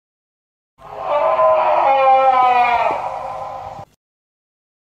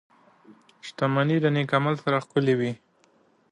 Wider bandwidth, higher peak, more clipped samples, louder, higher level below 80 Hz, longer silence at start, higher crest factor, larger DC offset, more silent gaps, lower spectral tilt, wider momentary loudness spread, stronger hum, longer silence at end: second, 8 kHz vs 10 kHz; first, -4 dBFS vs -8 dBFS; neither; first, -15 LUFS vs -24 LUFS; first, -56 dBFS vs -70 dBFS; first, 0.85 s vs 0.5 s; about the same, 14 dB vs 18 dB; neither; neither; second, -4.5 dB/octave vs -7.5 dB/octave; about the same, 17 LU vs 17 LU; neither; first, 1.1 s vs 0.75 s